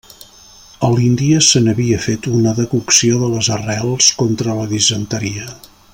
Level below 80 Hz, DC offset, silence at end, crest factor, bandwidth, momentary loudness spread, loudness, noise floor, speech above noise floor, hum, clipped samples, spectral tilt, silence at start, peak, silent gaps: -46 dBFS; under 0.1%; 0.35 s; 16 dB; 16.5 kHz; 10 LU; -14 LUFS; -42 dBFS; 28 dB; none; under 0.1%; -4 dB/octave; 0.2 s; 0 dBFS; none